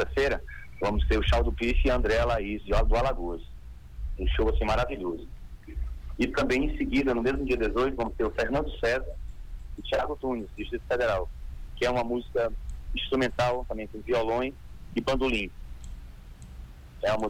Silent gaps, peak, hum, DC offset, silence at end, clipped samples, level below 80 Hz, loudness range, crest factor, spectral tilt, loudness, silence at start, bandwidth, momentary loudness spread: none; -12 dBFS; none; under 0.1%; 0 s; under 0.1%; -34 dBFS; 4 LU; 16 dB; -6 dB/octave; -29 LUFS; 0 s; 11 kHz; 19 LU